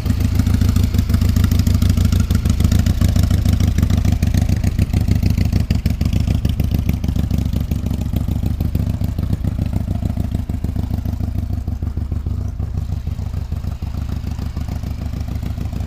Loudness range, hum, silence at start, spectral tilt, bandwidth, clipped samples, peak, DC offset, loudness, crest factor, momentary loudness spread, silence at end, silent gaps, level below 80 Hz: 8 LU; none; 0 s; -7 dB/octave; 16 kHz; under 0.1%; 0 dBFS; under 0.1%; -19 LUFS; 18 dB; 9 LU; 0 s; none; -22 dBFS